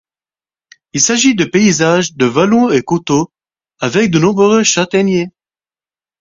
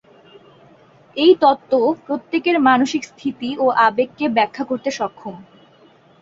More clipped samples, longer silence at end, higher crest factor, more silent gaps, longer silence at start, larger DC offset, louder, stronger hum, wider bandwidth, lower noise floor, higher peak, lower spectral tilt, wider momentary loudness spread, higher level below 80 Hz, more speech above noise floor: neither; about the same, 0.9 s vs 0.8 s; about the same, 14 dB vs 18 dB; neither; second, 0.95 s vs 1.15 s; neither; first, -12 LUFS vs -18 LUFS; neither; about the same, 7.6 kHz vs 7.8 kHz; first, under -90 dBFS vs -51 dBFS; about the same, 0 dBFS vs -2 dBFS; about the same, -4 dB/octave vs -4.5 dB/octave; second, 7 LU vs 12 LU; first, -52 dBFS vs -64 dBFS; first, over 79 dB vs 33 dB